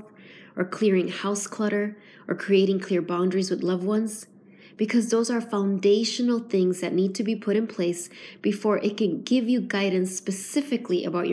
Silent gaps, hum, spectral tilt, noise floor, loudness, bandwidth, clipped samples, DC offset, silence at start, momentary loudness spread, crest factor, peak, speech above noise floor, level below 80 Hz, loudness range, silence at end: none; none; -5 dB/octave; -48 dBFS; -25 LUFS; 11 kHz; under 0.1%; under 0.1%; 0 s; 9 LU; 14 dB; -10 dBFS; 24 dB; -80 dBFS; 1 LU; 0 s